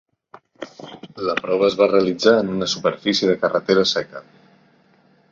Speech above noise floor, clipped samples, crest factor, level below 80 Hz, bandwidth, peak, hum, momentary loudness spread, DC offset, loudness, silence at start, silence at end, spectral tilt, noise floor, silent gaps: 38 dB; under 0.1%; 18 dB; -60 dBFS; 7.6 kHz; -2 dBFS; none; 21 LU; under 0.1%; -19 LUFS; 0.6 s; 1.1 s; -4.5 dB/octave; -57 dBFS; none